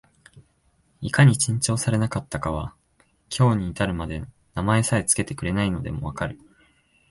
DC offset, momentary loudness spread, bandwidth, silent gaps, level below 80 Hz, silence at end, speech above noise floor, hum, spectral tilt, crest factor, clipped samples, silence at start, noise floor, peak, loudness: under 0.1%; 15 LU; 11.5 kHz; none; -42 dBFS; 0.75 s; 42 dB; none; -5 dB/octave; 22 dB; under 0.1%; 0.35 s; -64 dBFS; -2 dBFS; -23 LUFS